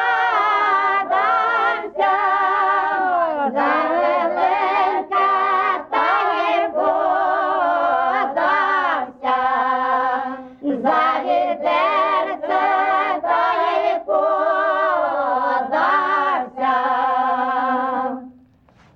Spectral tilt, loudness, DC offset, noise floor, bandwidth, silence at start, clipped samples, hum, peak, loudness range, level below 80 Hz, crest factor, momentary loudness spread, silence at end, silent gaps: -4.5 dB/octave; -18 LUFS; under 0.1%; -52 dBFS; 6.8 kHz; 0 s; under 0.1%; none; -6 dBFS; 1 LU; -64 dBFS; 12 dB; 4 LU; 0.65 s; none